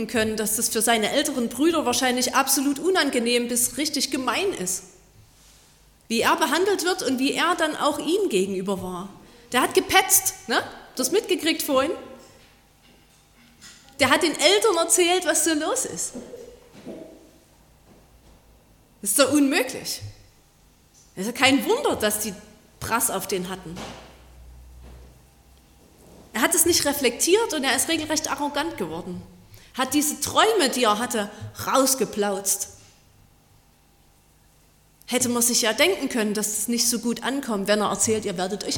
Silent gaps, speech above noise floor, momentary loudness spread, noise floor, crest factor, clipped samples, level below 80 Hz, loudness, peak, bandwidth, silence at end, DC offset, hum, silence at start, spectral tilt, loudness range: none; 35 dB; 14 LU; -58 dBFS; 24 dB; under 0.1%; -56 dBFS; -22 LUFS; -2 dBFS; 17.5 kHz; 0 s; under 0.1%; none; 0 s; -2 dB/octave; 6 LU